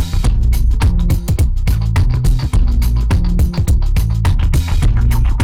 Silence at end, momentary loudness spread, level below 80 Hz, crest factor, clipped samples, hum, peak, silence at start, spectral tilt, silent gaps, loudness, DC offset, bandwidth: 0 s; 2 LU; -14 dBFS; 8 dB; under 0.1%; none; -4 dBFS; 0 s; -6.5 dB/octave; none; -16 LUFS; under 0.1%; 16 kHz